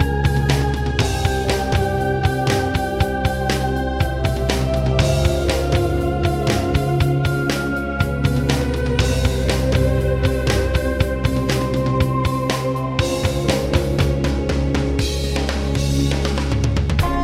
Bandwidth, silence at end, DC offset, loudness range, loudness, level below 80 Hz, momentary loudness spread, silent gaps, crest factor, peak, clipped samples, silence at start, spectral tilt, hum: 15.5 kHz; 0 s; under 0.1%; 1 LU; -19 LUFS; -24 dBFS; 3 LU; none; 14 dB; -4 dBFS; under 0.1%; 0 s; -6 dB/octave; none